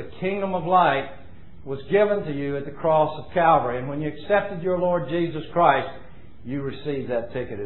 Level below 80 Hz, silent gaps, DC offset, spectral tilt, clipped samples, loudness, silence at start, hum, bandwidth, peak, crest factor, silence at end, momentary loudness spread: -52 dBFS; none; 1%; -10.5 dB/octave; under 0.1%; -23 LUFS; 0 s; none; 4.2 kHz; -4 dBFS; 20 dB; 0 s; 13 LU